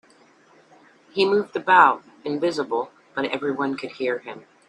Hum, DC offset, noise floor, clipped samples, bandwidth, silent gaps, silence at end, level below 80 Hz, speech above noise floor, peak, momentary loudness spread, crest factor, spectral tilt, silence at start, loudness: none; under 0.1%; -55 dBFS; under 0.1%; 10.5 kHz; none; 0.3 s; -72 dBFS; 33 dB; -2 dBFS; 15 LU; 22 dB; -5 dB/octave; 1.15 s; -22 LUFS